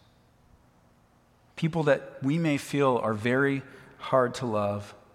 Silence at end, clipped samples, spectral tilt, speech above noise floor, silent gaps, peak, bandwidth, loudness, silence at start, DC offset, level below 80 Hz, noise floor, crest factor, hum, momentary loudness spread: 0.2 s; under 0.1%; -6.5 dB/octave; 35 dB; none; -10 dBFS; 15 kHz; -27 LUFS; 1.55 s; under 0.1%; -66 dBFS; -62 dBFS; 20 dB; none; 9 LU